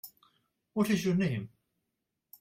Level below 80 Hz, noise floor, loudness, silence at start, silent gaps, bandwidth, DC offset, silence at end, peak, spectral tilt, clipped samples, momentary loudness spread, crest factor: -68 dBFS; -85 dBFS; -31 LUFS; 0.05 s; none; 16.5 kHz; under 0.1%; 0.95 s; -16 dBFS; -6.5 dB/octave; under 0.1%; 20 LU; 18 dB